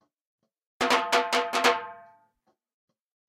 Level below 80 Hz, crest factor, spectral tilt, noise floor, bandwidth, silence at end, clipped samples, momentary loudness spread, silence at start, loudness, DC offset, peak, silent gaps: -72 dBFS; 22 dB; -1 dB/octave; -73 dBFS; 16.5 kHz; 1.25 s; under 0.1%; 9 LU; 0.8 s; -25 LUFS; under 0.1%; -8 dBFS; none